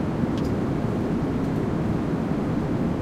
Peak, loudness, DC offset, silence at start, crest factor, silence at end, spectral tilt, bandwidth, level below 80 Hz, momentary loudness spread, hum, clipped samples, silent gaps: -10 dBFS; -25 LUFS; under 0.1%; 0 s; 14 dB; 0 s; -8.5 dB/octave; 13.5 kHz; -40 dBFS; 0 LU; none; under 0.1%; none